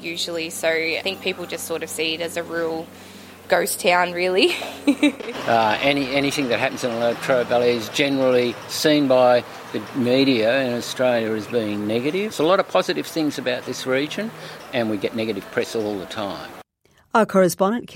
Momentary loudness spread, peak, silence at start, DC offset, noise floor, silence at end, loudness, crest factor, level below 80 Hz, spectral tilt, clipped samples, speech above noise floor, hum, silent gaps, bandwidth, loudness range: 11 LU; -2 dBFS; 0 s; under 0.1%; -59 dBFS; 0 s; -21 LUFS; 18 dB; -62 dBFS; -4 dB/octave; under 0.1%; 38 dB; none; none; 16.5 kHz; 6 LU